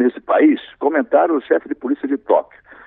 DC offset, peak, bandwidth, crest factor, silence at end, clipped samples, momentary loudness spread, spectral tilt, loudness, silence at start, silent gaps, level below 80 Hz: under 0.1%; -2 dBFS; 4 kHz; 16 dB; 0.45 s; under 0.1%; 7 LU; -9.5 dB/octave; -17 LUFS; 0 s; none; -64 dBFS